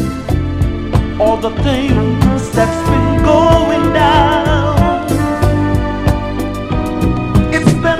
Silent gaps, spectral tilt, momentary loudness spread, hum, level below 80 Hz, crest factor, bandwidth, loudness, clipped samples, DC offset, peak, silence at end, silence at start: none; -6.5 dB/octave; 7 LU; none; -22 dBFS; 12 dB; 15.5 kHz; -13 LUFS; 0.2%; under 0.1%; 0 dBFS; 0 s; 0 s